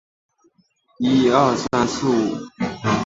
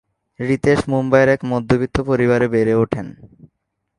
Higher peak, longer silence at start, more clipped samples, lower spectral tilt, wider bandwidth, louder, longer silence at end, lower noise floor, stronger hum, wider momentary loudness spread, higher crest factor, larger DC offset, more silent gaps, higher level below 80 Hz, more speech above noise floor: about the same, -2 dBFS vs 0 dBFS; first, 1 s vs 0.4 s; neither; second, -5.5 dB/octave vs -7.5 dB/octave; second, 8 kHz vs 11.5 kHz; about the same, -19 LUFS vs -17 LUFS; second, 0 s vs 0.7 s; second, -62 dBFS vs -71 dBFS; neither; about the same, 10 LU vs 8 LU; about the same, 18 dB vs 18 dB; neither; neither; second, -50 dBFS vs -42 dBFS; second, 43 dB vs 55 dB